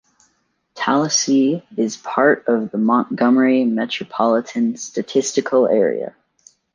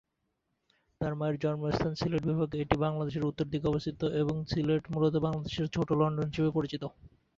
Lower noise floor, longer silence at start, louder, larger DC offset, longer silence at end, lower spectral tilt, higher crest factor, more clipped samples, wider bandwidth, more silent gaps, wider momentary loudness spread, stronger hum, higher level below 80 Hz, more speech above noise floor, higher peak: second, -66 dBFS vs -81 dBFS; second, 0.75 s vs 1 s; first, -18 LUFS vs -31 LUFS; neither; first, 0.65 s vs 0.3 s; second, -4 dB/octave vs -8 dB/octave; second, 16 dB vs 22 dB; neither; first, 10 kHz vs 7.4 kHz; neither; first, 8 LU vs 5 LU; neither; second, -68 dBFS vs -52 dBFS; about the same, 49 dB vs 50 dB; first, -2 dBFS vs -10 dBFS